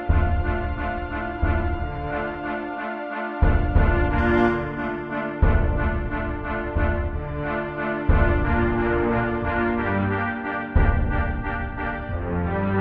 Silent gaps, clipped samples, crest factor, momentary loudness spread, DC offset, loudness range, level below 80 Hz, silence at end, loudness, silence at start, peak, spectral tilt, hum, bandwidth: none; under 0.1%; 16 dB; 8 LU; under 0.1%; 3 LU; -26 dBFS; 0 s; -24 LUFS; 0 s; -6 dBFS; -10 dB/octave; none; 4.8 kHz